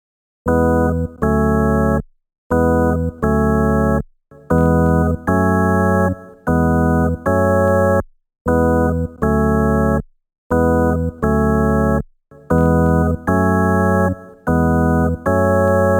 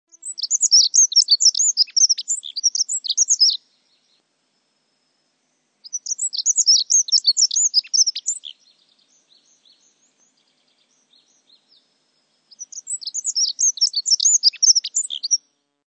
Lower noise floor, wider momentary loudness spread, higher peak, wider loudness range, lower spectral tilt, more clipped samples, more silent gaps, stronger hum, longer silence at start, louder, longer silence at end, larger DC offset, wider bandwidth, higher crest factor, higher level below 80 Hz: second, -35 dBFS vs -69 dBFS; second, 6 LU vs 15 LU; about the same, -4 dBFS vs -4 dBFS; second, 1 LU vs 12 LU; first, -9.5 dB/octave vs 8 dB/octave; neither; first, 2.38-2.50 s, 8.41-8.45 s, 10.38-10.50 s vs none; neither; first, 0.45 s vs 0.25 s; about the same, -16 LUFS vs -15 LUFS; second, 0 s vs 0.5 s; neither; first, 17 kHz vs 9.2 kHz; second, 12 dB vs 18 dB; first, -28 dBFS vs under -90 dBFS